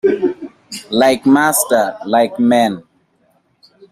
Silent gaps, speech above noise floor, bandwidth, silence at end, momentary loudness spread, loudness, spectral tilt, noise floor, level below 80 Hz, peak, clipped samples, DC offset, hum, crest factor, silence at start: none; 46 dB; 15.5 kHz; 1.1 s; 18 LU; -14 LUFS; -3.5 dB/octave; -59 dBFS; -58 dBFS; -2 dBFS; under 0.1%; under 0.1%; none; 14 dB; 0.05 s